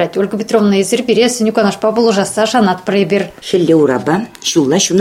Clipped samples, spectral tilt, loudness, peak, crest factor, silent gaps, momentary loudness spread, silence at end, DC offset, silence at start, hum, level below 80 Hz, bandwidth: under 0.1%; -4.5 dB/octave; -13 LUFS; 0 dBFS; 12 dB; none; 5 LU; 0 s; under 0.1%; 0 s; none; -52 dBFS; 16 kHz